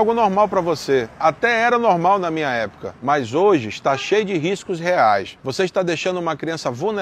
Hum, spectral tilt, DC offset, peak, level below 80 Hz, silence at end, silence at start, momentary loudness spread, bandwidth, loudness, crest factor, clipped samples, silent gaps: none; -5 dB/octave; under 0.1%; -4 dBFS; -56 dBFS; 0 s; 0 s; 8 LU; 13.5 kHz; -19 LUFS; 16 dB; under 0.1%; none